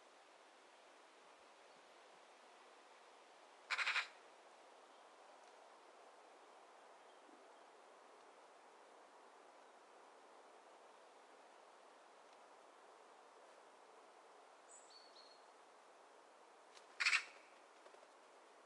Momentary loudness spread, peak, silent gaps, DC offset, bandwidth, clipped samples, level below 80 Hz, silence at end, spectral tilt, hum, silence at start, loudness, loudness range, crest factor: 22 LU; -24 dBFS; none; under 0.1%; 11 kHz; under 0.1%; under -90 dBFS; 0 s; 2 dB/octave; none; 0 s; -41 LUFS; 18 LU; 30 dB